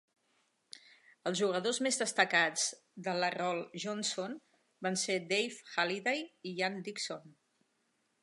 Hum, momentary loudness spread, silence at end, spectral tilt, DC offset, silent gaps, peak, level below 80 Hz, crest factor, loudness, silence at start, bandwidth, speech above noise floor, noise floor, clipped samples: none; 14 LU; 0.9 s; -2.5 dB/octave; under 0.1%; none; -10 dBFS; -88 dBFS; 26 dB; -34 LUFS; 1.25 s; 11.5 kHz; 43 dB; -78 dBFS; under 0.1%